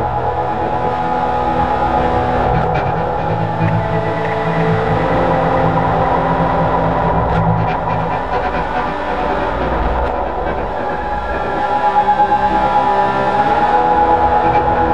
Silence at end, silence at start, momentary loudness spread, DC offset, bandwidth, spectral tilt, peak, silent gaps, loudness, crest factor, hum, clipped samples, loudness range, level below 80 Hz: 0 s; 0 s; 6 LU; 3%; 8.6 kHz; -8 dB/octave; -2 dBFS; none; -15 LUFS; 12 dB; none; under 0.1%; 4 LU; -28 dBFS